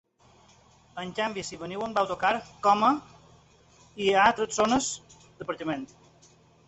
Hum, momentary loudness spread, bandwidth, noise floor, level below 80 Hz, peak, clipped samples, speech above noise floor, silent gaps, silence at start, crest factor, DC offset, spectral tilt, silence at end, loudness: none; 17 LU; 8.4 kHz; -59 dBFS; -60 dBFS; -6 dBFS; under 0.1%; 33 dB; none; 0.95 s; 22 dB; under 0.1%; -3 dB/octave; 0.8 s; -27 LUFS